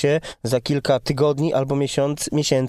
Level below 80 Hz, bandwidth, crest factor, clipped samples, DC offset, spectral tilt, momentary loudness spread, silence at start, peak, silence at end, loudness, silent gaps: -50 dBFS; 14 kHz; 14 dB; under 0.1%; under 0.1%; -5.5 dB/octave; 4 LU; 0 s; -6 dBFS; 0 s; -21 LUFS; none